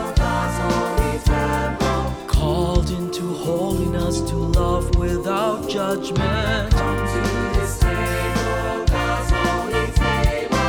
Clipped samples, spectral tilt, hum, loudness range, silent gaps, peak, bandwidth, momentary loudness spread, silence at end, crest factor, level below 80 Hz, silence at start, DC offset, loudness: under 0.1%; -5.5 dB/octave; none; 1 LU; none; -4 dBFS; over 20 kHz; 3 LU; 0 s; 14 dB; -24 dBFS; 0 s; under 0.1%; -21 LUFS